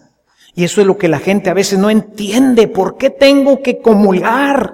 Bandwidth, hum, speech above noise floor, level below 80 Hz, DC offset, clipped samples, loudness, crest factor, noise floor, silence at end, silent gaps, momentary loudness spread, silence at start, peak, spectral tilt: 16.5 kHz; none; 39 dB; -48 dBFS; under 0.1%; under 0.1%; -11 LUFS; 12 dB; -50 dBFS; 0 s; none; 6 LU; 0.55 s; 0 dBFS; -5.5 dB/octave